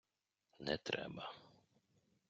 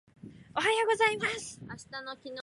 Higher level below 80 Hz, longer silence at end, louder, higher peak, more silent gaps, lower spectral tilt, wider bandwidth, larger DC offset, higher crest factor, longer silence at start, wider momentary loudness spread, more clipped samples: second, -76 dBFS vs -68 dBFS; first, 0.8 s vs 0 s; second, -45 LUFS vs -29 LUFS; second, -22 dBFS vs -14 dBFS; neither; about the same, -2.5 dB/octave vs -2.5 dB/octave; second, 7.6 kHz vs 11.5 kHz; neither; first, 26 dB vs 18 dB; first, 0.6 s vs 0.25 s; second, 11 LU vs 16 LU; neither